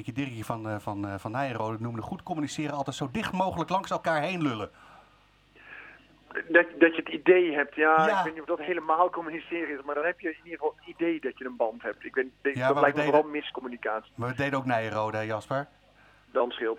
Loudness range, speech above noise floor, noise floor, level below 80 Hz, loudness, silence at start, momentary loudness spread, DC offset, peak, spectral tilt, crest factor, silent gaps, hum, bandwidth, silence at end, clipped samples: 7 LU; 33 dB; -61 dBFS; -64 dBFS; -28 LUFS; 0 s; 13 LU; under 0.1%; -6 dBFS; -6 dB/octave; 22 dB; none; 50 Hz at -65 dBFS; 14.5 kHz; 0 s; under 0.1%